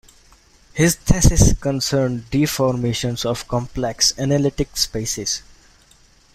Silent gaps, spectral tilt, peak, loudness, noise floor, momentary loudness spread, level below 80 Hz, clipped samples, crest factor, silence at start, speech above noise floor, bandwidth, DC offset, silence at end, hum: none; -4.5 dB/octave; 0 dBFS; -19 LUFS; -52 dBFS; 8 LU; -28 dBFS; under 0.1%; 20 dB; 0.75 s; 34 dB; 16 kHz; under 0.1%; 0.95 s; none